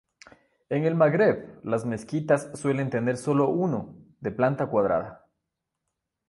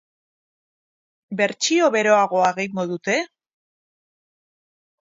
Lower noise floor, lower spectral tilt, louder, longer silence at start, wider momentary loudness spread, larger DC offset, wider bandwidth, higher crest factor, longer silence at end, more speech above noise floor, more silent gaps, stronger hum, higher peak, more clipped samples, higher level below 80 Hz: second, -83 dBFS vs under -90 dBFS; first, -7.5 dB/octave vs -3.5 dB/octave; second, -26 LUFS vs -20 LUFS; second, 0.7 s vs 1.3 s; about the same, 11 LU vs 9 LU; neither; first, 11.5 kHz vs 7.8 kHz; about the same, 18 dB vs 20 dB; second, 1.15 s vs 1.8 s; second, 58 dB vs over 70 dB; neither; neither; second, -8 dBFS vs -4 dBFS; neither; first, -62 dBFS vs -76 dBFS